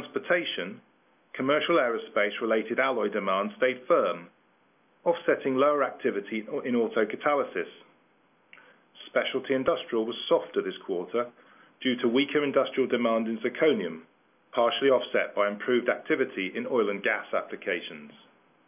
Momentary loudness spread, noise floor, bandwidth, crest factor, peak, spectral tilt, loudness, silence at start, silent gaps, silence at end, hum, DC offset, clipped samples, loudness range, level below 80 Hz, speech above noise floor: 9 LU; -65 dBFS; 3.7 kHz; 18 dB; -10 dBFS; -8.5 dB/octave; -27 LUFS; 0 s; none; 0.55 s; none; under 0.1%; under 0.1%; 4 LU; -78 dBFS; 38 dB